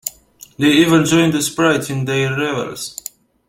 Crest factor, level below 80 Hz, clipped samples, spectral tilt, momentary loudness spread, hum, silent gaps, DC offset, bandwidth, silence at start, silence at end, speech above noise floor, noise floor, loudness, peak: 16 dB; -52 dBFS; under 0.1%; -4.5 dB/octave; 15 LU; none; none; under 0.1%; 16.5 kHz; 0.05 s; 0.55 s; 24 dB; -40 dBFS; -15 LUFS; -2 dBFS